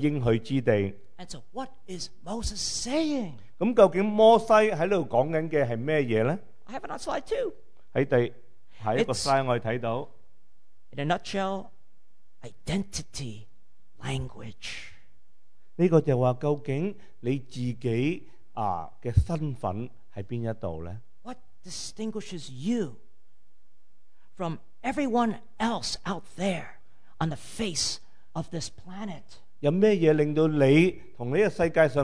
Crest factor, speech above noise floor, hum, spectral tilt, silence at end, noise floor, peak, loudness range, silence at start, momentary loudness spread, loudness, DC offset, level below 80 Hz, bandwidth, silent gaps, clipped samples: 22 dB; 44 dB; none; -5.5 dB/octave; 0 s; -70 dBFS; -6 dBFS; 13 LU; 0 s; 18 LU; -27 LUFS; 1%; -48 dBFS; 11 kHz; none; under 0.1%